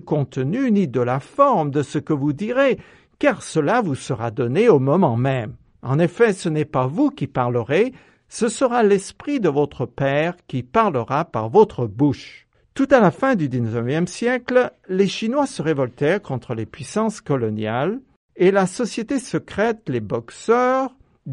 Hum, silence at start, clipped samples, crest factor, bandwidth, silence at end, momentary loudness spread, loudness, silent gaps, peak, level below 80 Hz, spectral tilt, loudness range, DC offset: none; 0.05 s; under 0.1%; 18 dB; 11 kHz; 0 s; 9 LU; -20 LUFS; 18.16-18.28 s; -2 dBFS; -56 dBFS; -6.5 dB/octave; 3 LU; under 0.1%